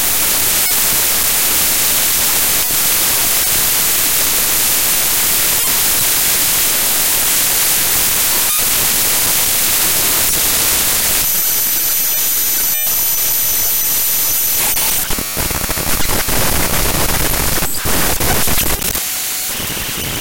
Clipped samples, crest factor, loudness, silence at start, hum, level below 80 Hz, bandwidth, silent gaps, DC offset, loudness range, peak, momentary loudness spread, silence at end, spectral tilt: under 0.1%; 14 dB; -11 LUFS; 0 s; none; -30 dBFS; 17.5 kHz; none; under 0.1%; 4 LU; -2 dBFS; 5 LU; 0 s; -0.5 dB/octave